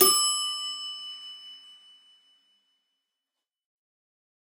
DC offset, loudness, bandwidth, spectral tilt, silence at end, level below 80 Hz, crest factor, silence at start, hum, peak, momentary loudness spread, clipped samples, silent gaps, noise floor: under 0.1%; -26 LUFS; 16 kHz; 0.5 dB/octave; 2.75 s; -80 dBFS; 26 dB; 0 s; none; -4 dBFS; 23 LU; under 0.1%; none; -88 dBFS